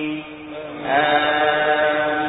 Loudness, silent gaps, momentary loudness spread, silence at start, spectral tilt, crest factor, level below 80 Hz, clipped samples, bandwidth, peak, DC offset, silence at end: -18 LUFS; none; 15 LU; 0 s; -9 dB/octave; 16 dB; -56 dBFS; under 0.1%; 4 kHz; -4 dBFS; under 0.1%; 0 s